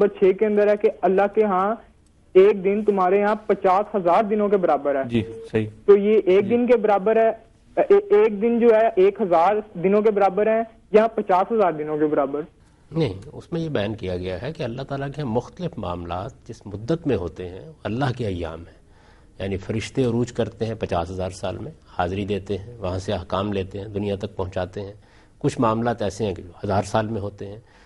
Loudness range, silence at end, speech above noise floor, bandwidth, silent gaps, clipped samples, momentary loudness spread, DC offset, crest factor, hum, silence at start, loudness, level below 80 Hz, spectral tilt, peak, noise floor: 10 LU; 0.25 s; 30 dB; 11 kHz; none; under 0.1%; 14 LU; under 0.1%; 18 dB; none; 0 s; -22 LUFS; -52 dBFS; -7.5 dB/octave; -4 dBFS; -51 dBFS